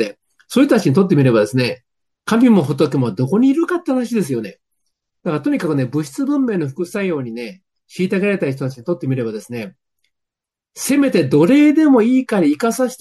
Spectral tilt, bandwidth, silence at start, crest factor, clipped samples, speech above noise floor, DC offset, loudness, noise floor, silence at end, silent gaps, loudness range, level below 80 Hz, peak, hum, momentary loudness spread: -6.5 dB/octave; 12.5 kHz; 0 s; 16 dB; under 0.1%; 69 dB; under 0.1%; -16 LUFS; -85 dBFS; 0.05 s; none; 7 LU; -62 dBFS; -2 dBFS; none; 15 LU